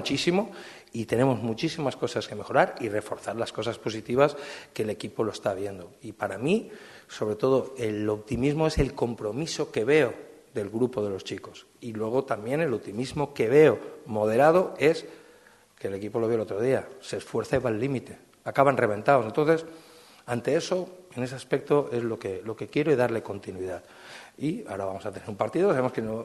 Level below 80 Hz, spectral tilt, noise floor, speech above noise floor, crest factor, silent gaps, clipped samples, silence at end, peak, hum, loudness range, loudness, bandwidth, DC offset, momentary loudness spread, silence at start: -52 dBFS; -6 dB/octave; -56 dBFS; 30 dB; 22 dB; none; under 0.1%; 0 s; -4 dBFS; none; 5 LU; -27 LUFS; 12.5 kHz; under 0.1%; 15 LU; 0 s